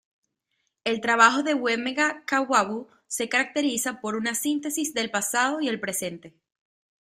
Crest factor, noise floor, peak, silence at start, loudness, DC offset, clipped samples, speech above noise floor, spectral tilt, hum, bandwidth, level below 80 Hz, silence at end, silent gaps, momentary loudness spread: 22 dB; -77 dBFS; -4 dBFS; 0.85 s; -24 LUFS; under 0.1%; under 0.1%; 52 dB; -2 dB/octave; none; 16 kHz; -72 dBFS; 0.75 s; none; 12 LU